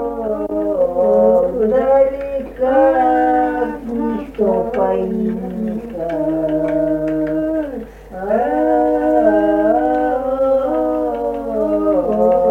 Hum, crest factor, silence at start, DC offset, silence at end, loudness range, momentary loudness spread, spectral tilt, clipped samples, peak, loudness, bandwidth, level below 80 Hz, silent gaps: none; 14 dB; 0 s; under 0.1%; 0 s; 5 LU; 9 LU; -8.5 dB/octave; under 0.1%; -2 dBFS; -16 LUFS; 4.3 kHz; -40 dBFS; none